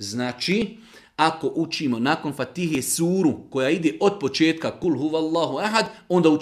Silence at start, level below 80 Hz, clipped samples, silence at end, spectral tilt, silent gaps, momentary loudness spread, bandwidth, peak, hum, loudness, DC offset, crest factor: 0 s; -60 dBFS; under 0.1%; 0 s; -4.5 dB/octave; none; 5 LU; 15 kHz; -2 dBFS; none; -23 LUFS; under 0.1%; 20 dB